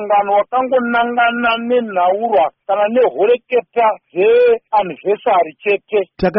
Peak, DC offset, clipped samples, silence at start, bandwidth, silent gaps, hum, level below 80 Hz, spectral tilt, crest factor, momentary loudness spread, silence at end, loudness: -4 dBFS; under 0.1%; under 0.1%; 0 s; 5.6 kHz; none; none; -48 dBFS; -3 dB/octave; 12 dB; 4 LU; 0 s; -15 LUFS